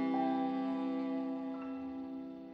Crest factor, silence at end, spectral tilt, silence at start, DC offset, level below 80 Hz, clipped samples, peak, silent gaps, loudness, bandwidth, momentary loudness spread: 14 dB; 0 s; -8 dB/octave; 0 s; under 0.1%; -74 dBFS; under 0.1%; -24 dBFS; none; -38 LUFS; 5.4 kHz; 10 LU